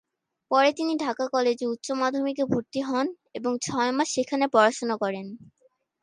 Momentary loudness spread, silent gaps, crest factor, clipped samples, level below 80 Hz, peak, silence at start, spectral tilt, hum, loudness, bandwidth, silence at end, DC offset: 9 LU; none; 20 dB; under 0.1%; -70 dBFS; -6 dBFS; 0.5 s; -4 dB/octave; none; -25 LUFS; 11.5 kHz; 0.6 s; under 0.1%